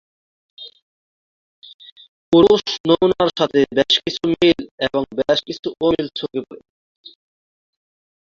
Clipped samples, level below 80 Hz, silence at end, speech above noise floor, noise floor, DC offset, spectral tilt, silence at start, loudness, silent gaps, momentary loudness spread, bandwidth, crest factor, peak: under 0.1%; -52 dBFS; 1.8 s; over 73 dB; under -90 dBFS; under 0.1%; -5 dB/octave; 0.6 s; -17 LUFS; 0.82-1.62 s, 1.74-1.79 s, 1.92-1.96 s, 2.08-2.32 s, 2.80-2.84 s, 4.71-4.78 s; 17 LU; 7.4 kHz; 18 dB; -2 dBFS